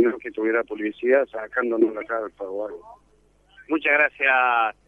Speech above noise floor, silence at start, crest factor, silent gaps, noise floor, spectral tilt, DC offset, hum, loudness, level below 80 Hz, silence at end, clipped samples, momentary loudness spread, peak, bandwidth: 36 dB; 0 s; 18 dB; none; -59 dBFS; -6 dB/octave; under 0.1%; 50 Hz at -65 dBFS; -22 LUFS; -64 dBFS; 0.15 s; under 0.1%; 13 LU; -6 dBFS; 3.9 kHz